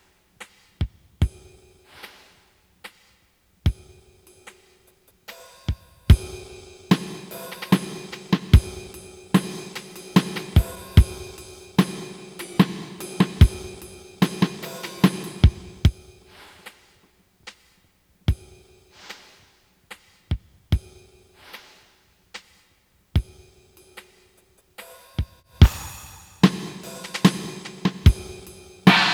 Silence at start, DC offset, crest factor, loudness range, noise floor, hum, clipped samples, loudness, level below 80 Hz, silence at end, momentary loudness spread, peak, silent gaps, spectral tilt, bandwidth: 0.8 s; under 0.1%; 24 dB; 13 LU; -62 dBFS; none; under 0.1%; -23 LUFS; -30 dBFS; 0 s; 25 LU; 0 dBFS; none; -6 dB/octave; 17.5 kHz